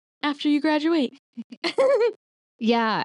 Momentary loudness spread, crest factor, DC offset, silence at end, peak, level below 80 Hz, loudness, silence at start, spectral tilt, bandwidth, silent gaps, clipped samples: 10 LU; 14 dB; under 0.1%; 0 s; -10 dBFS; -78 dBFS; -23 LUFS; 0.25 s; -5 dB/octave; 11 kHz; 1.19-1.33 s, 1.44-1.50 s, 1.57-1.62 s, 2.16-2.59 s; under 0.1%